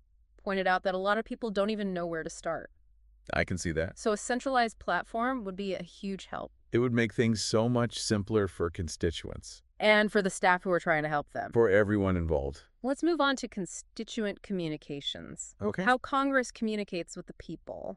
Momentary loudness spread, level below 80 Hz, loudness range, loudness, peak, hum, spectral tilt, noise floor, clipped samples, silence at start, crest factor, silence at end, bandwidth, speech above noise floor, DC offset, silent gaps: 13 LU; -52 dBFS; 5 LU; -30 LUFS; -10 dBFS; none; -5 dB/octave; -61 dBFS; under 0.1%; 0.45 s; 20 dB; 0 s; 11.5 kHz; 31 dB; under 0.1%; none